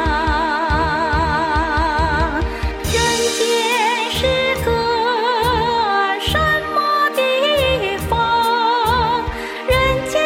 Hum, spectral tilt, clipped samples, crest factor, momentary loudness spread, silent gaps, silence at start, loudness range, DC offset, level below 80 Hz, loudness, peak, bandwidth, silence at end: none; -4 dB/octave; under 0.1%; 12 dB; 4 LU; none; 0 s; 1 LU; under 0.1%; -28 dBFS; -17 LUFS; -4 dBFS; 16.5 kHz; 0 s